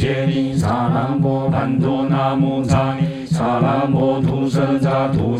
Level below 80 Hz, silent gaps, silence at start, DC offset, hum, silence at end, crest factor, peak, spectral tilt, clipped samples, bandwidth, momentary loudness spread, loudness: -42 dBFS; none; 0 s; under 0.1%; none; 0 s; 14 dB; -2 dBFS; -8 dB/octave; under 0.1%; 11 kHz; 2 LU; -18 LUFS